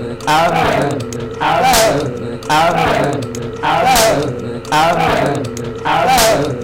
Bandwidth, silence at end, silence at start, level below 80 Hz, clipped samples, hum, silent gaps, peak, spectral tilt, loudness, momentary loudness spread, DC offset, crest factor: 17 kHz; 0 s; 0 s; -36 dBFS; under 0.1%; none; none; 0 dBFS; -3.5 dB/octave; -14 LUFS; 11 LU; under 0.1%; 14 dB